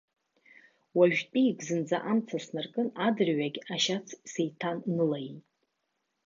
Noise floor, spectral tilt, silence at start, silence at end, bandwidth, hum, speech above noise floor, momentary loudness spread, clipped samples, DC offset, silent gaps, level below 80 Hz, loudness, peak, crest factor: -81 dBFS; -5 dB/octave; 0.95 s; 0.9 s; 7.6 kHz; none; 51 dB; 10 LU; under 0.1%; under 0.1%; none; -82 dBFS; -30 LUFS; -10 dBFS; 20 dB